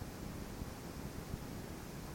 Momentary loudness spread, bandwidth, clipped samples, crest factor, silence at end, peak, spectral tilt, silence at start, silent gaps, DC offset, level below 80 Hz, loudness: 1 LU; 17 kHz; under 0.1%; 18 dB; 0 s; -28 dBFS; -5.5 dB/octave; 0 s; none; under 0.1%; -52 dBFS; -47 LUFS